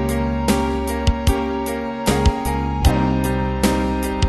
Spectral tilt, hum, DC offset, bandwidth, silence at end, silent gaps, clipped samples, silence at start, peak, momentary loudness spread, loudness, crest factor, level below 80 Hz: -6 dB/octave; none; under 0.1%; 12.5 kHz; 0 s; none; under 0.1%; 0 s; -2 dBFS; 4 LU; -20 LUFS; 16 dB; -24 dBFS